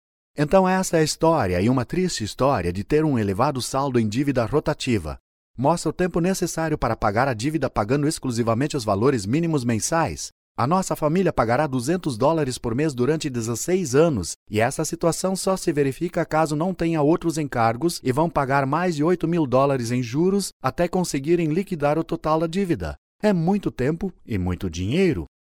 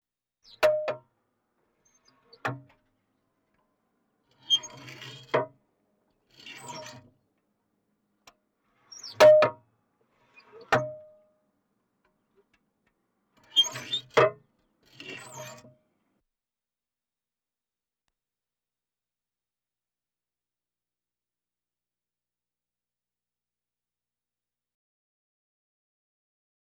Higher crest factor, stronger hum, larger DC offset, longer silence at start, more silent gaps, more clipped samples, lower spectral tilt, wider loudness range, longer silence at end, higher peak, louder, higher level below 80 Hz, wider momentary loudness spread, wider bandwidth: second, 18 dB vs 24 dB; second, none vs 60 Hz at -75 dBFS; neither; second, 0.35 s vs 0.6 s; first, 5.20-5.54 s, 10.32-10.55 s, 14.36-14.46 s, 20.53-20.60 s, 22.98-23.19 s vs none; neither; first, -5.5 dB/octave vs -3 dB/octave; second, 2 LU vs 21 LU; second, 0.25 s vs 11.2 s; first, -4 dBFS vs -8 dBFS; about the same, -22 LUFS vs -24 LUFS; first, -44 dBFS vs -70 dBFS; second, 5 LU vs 24 LU; about the same, 17.5 kHz vs 19 kHz